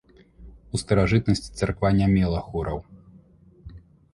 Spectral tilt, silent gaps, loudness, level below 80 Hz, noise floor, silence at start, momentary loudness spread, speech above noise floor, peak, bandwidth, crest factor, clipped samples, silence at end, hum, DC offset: -7 dB/octave; none; -24 LUFS; -38 dBFS; -53 dBFS; 0.4 s; 12 LU; 30 dB; -6 dBFS; 11.5 kHz; 20 dB; under 0.1%; 0.35 s; none; under 0.1%